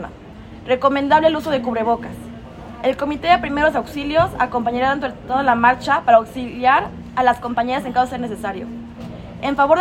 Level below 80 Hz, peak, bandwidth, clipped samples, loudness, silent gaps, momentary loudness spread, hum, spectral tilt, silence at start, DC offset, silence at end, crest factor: -44 dBFS; 0 dBFS; 16 kHz; under 0.1%; -18 LUFS; none; 19 LU; none; -6 dB/octave; 0 s; under 0.1%; 0 s; 18 dB